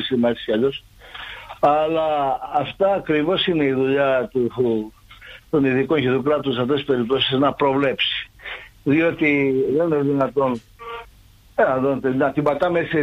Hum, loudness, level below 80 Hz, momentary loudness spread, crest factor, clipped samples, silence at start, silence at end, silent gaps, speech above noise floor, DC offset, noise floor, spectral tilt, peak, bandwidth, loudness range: none; -20 LUFS; -52 dBFS; 15 LU; 14 dB; under 0.1%; 0 s; 0 s; none; 30 dB; under 0.1%; -49 dBFS; -7.5 dB/octave; -6 dBFS; 8.4 kHz; 2 LU